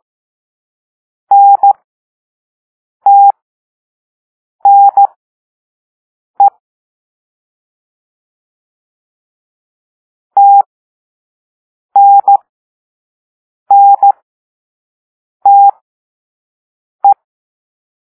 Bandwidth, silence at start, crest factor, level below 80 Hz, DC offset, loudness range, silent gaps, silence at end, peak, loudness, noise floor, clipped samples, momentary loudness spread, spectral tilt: 1.5 kHz; 1.3 s; 12 dB; -78 dBFS; under 0.1%; 9 LU; 1.84-3.00 s, 3.42-4.59 s, 5.16-6.34 s, 6.60-10.30 s, 10.66-11.89 s, 12.49-13.66 s, 14.22-15.40 s, 15.81-16.99 s; 1.05 s; 0 dBFS; -8 LUFS; under -90 dBFS; under 0.1%; 9 LU; -6.5 dB/octave